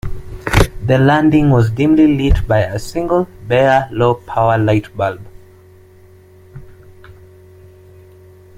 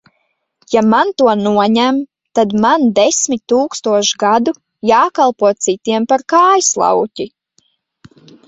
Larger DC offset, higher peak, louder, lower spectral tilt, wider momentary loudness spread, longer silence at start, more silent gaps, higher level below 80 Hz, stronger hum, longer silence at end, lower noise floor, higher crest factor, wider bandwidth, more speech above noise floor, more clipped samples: neither; about the same, 0 dBFS vs 0 dBFS; about the same, -14 LUFS vs -13 LUFS; first, -7 dB/octave vs -3.5 dB/octave; first, 10 LU vs 7 LU; second, 0.05 s vs 0.7 s; neither; first, -28 dBFS vs -56 dBFS; neither; first, 1.45 s vs 1.2 s; second, -43 dBFS vs -66 dBFS; about the same, 14 dB vs 14 dB; first, 15.5 kHz vs 8.2 kHz; second, 30 dB vs 53 dB; neither